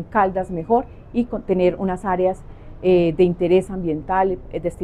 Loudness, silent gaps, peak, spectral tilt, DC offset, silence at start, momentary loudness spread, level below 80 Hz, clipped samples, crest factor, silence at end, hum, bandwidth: -20 LUFS; none; -6 dBFS; -8 dB/octave; under 0.1%; 0 s; 9 LU; -40 dBFS; under 0.1%; 14 dB; 0 s; none; 10.5 kHz